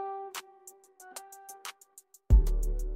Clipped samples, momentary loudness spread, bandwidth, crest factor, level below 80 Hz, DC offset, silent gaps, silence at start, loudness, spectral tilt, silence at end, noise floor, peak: under 0.1%; 26 LU; 16 kHz; 20 dB; -30 dBFS; under 0.1%; none; 0 s; -31 LUFS; -5.5 dB/octave; 0 s; -59 dBFS; -10 dBFS